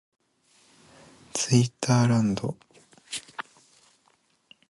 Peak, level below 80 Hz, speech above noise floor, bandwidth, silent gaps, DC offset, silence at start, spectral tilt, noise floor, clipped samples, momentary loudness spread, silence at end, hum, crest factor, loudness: -6 dBFS; -62 dBFS; 44 dB; 11.5 kHz; none; under 0.1%; 1.35 s; -5.5 dB/octave; -67 dBFS; under 0.1%; 19 LU; 1.3 s; none; 22 dB; -25 LUFS